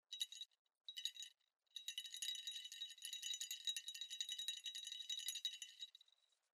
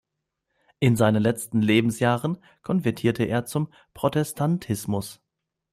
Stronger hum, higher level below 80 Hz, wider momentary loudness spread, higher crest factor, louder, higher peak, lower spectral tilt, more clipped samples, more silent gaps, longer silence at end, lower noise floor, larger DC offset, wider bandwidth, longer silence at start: neither; second, under -90 dBFS vs -58 dBFS; about the same, 11 LU vs 10 LU; about the same, 24 dB vs 20 dB; second, -48 LUFS vs -24 LUFS; second, -28 dBFS vs -4 dBFS; second, 9 dB/octave vs -6 dB/octave; neither; first, 0.59-0.65 s vs none; about the same, 0.55 s vs 0.6 s; second, -77 dBFS vs -82 dBFS; neither; about the same, 15.5 kHz vs 16 kHz; second, 0.1 s vs 0.8 s